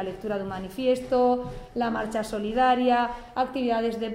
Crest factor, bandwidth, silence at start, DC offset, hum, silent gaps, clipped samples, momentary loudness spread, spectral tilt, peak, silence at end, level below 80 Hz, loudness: 16 dB; 15.5 kHz; 0 s; under 0.1%; none; none; under 0.1%; 9 LU; -5.5 dB/octave; -10 dBFS; 0 s; -50 dBFS; -26 LUFS